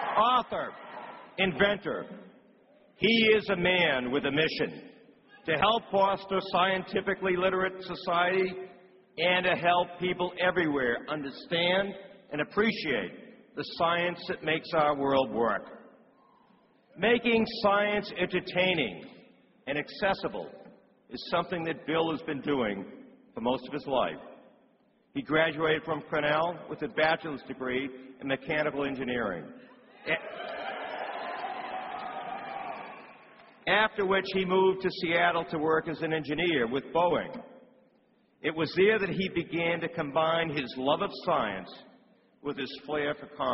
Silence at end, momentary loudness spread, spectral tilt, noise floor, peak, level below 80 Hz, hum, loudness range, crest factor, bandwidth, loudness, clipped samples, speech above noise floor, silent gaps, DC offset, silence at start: 0 s; 15 LU; -2.5 dB/octave; -67 dBFS; -10 dBFS; -62 dBFS; none; 6 LU; 20 dB; 5.8 kHz; -29 LUFS; under 0.1%; 38 dB; none; under 0.1%; 0 s